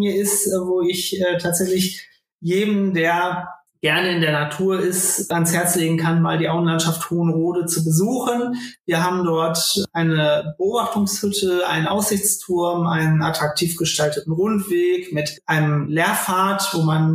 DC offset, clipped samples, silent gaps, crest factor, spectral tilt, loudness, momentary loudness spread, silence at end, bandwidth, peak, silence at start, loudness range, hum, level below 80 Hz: under 0.1%; under 0.1%; 2.32-2.39 s, 8.80-8.84 s; 14 dB; -4.5 dB/octave; -19 LUFS; 4 LU; 0 s; 15.5 kHz; -6 dBFS; 0 s; 1 LU; none; -58 dBFS